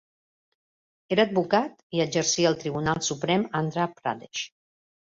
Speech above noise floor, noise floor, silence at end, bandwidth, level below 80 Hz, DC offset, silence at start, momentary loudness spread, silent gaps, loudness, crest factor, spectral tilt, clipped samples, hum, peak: over 64 dB; under -90 dBFS; 0.65 s; 7.8 kHz; -62 dBFS; under 0.1%; 1.1 s; 10 LU; 1.83-1.90 s; -26 LUFS; 20 dB; -4 dB/octave; under 0.1%; none; -6 dBFS